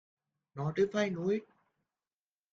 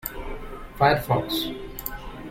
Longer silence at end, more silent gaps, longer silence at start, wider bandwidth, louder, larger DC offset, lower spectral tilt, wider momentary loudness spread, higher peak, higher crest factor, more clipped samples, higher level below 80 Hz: first, 1.1 s vs 0 s; neither; first, 0.55 s vs 0.05 s; second, 7.4 kHz vs 16.5 kHz; second, -33 LUFS vs -25 LUFS; neither; first, -6.5 dB/octave vs -5 dB/octave; second, 8 LU vs 17 LU; second, -18 dBFS vs -6 dBFS; about the same, 18 dB vs 20 dB; neither; second, -74 dBFS vs -40 dBFS